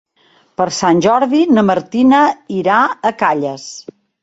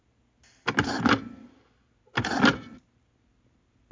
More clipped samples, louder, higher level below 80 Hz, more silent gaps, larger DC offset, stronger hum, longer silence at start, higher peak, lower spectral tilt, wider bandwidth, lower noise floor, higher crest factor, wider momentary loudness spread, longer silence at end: neither; first, -13 LUFS vs -26 LUFS; about the same, -56 dBFS vs -52 dBFS; neither; neither; neither; about the same, 0.6 s vs 0.65 s; first, 0 dBFS vs -6 dBFS; about the same, -5 dB/octave vs -4.5 dB/octave; about the same, 8 kHz vs 7.6 kHz; second, -53 dBFS vs -67 dBFS; second, 14 dB vs 24 dB; about the same, 14 LU vs 16 LU; second, 0.4 s vs 1.15 s